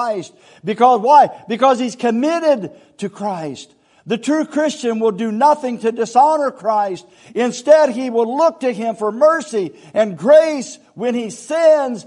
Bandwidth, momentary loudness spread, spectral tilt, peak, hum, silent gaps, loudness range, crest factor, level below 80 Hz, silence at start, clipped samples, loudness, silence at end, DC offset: 11 kHz; 14 LU; -5 dB/octave; 0 dBFS; none; none; 4 LU; 16 dB; -72 dBFS; 0 s; under 0.1%; -16 LUFS; 0.05 s; under 0.1%